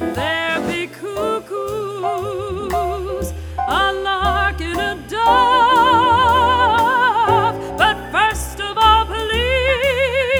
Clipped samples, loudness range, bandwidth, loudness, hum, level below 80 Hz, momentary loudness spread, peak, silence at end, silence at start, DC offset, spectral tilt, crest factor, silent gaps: under 0.1%; 8 LU; over 20 kHz; -17 LUFS; none; -32 dBFS; 11 LU; 0 dBFS; 0 s; 0 s; under 0.1%; -4 dB/octave; 16 dB; none